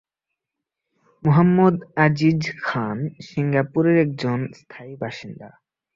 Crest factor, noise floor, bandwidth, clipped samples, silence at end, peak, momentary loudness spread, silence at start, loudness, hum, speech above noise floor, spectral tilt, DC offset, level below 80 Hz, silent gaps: 18 dB; -84 dBFS; 7.4 kHz; under 0.1%; 0.5 s; -4 dBFS; 18 LU; 1.25 s; -20 LUFS; none; 64 dB; -8 dB/octave; under 0.1%; -58 dBFS; none